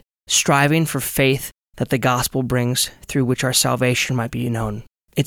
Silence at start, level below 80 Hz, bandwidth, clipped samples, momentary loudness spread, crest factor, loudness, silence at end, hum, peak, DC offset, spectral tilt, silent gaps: 0.3 s; -44 dBFS; 19 kHz; under 0.1%; 10 LU; 16 dB; -19 LUFS; 0 s; none; -4 dBFS; under 0.1%; -4 dB/octave; none